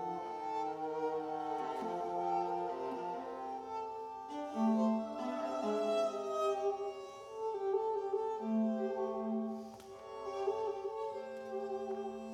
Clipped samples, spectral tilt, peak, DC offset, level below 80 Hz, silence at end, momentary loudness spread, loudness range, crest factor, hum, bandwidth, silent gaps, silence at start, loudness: under 0.1%; -6.5 dB/octave; -24 dBFS; under 0.1%; -78 dBFS; 0 s; 9 LU; 3 LU; 14 dB; none; 11.5 kHz; none; 0 s; -38 LUFS